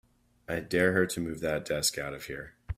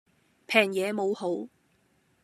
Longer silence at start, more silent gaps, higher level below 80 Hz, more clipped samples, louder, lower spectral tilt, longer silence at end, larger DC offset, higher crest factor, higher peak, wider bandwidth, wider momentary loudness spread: about the same, 0.5 s vs 0.5 s; neither; first, -52 dBFS vs -82 dBFS; neither; second, -30 LUFS vs -27 LUFS; about the same, -3.5 dB/octave vs -4.5 dB/octave; second, 0.05 s vs 0.75 s; neither; about the same, 22 dB vs 26 dB; second, -10 dBFS vs -4 dBFS; first, 16 kHz vs 14 kHz; about the same, 13 LU vs 12 LU